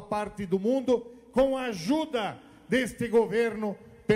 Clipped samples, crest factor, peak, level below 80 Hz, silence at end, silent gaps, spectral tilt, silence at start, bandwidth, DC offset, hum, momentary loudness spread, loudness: under 0.1%; 16 dB; -12 dBFS; -56 dBFS; 0 s; none; -5.5 dB/octave; 0 s; 15.5 kHz; under 0.1%; none; 9 LU; -28 LUFS